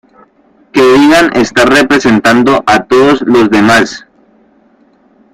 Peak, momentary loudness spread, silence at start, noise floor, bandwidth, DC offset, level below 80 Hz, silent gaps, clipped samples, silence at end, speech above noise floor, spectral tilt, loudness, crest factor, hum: 0 dBFS; 4 LU; 0.75 s; -47 dBFS; 15.5 kHz; under 0.1%; -40 dBFS; none; 0.2%; 1.35 s; 40 dB; -4.5 dB/octave; -7 LUFS; 8 dB; none